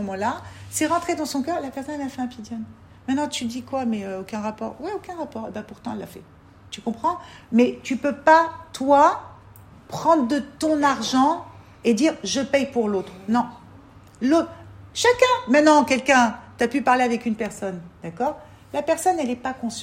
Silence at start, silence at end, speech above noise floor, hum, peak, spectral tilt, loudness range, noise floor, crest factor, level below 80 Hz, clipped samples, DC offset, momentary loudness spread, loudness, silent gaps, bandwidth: 0 s; 0 s; 25 dB; none; -2 dBFS; -4 dB/octave; 9 LU; -47 dBFS; 22 dB; -58 dBFS; under 0.1%; under 0.1%; 16 LU; -22 LUFS; none; 16 kHz